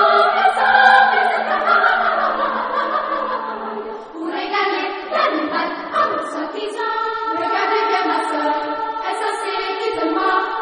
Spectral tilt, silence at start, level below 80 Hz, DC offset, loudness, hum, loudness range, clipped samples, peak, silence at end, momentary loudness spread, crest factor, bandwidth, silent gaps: -3 dB/octave; 0 s; -58 dBFS; under 0.1%; -18 LUFS; none; 6 LU; under 0.1%; 0 dBFS; 0 s; 11 LU; 18 dB; 10 kHz; none